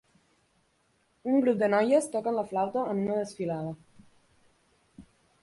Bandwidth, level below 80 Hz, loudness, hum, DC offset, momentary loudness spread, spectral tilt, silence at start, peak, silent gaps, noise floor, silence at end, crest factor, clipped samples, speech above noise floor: 11.5 kHz; -70 dBFS; -28 LUFS; none; under 0.1%; 12 LU; -6.5 dB/octave; 1.25 s; -12 dBFS; none; -70 dBFS; 0.4 s; 18 dB; under 0.1%; 43 dB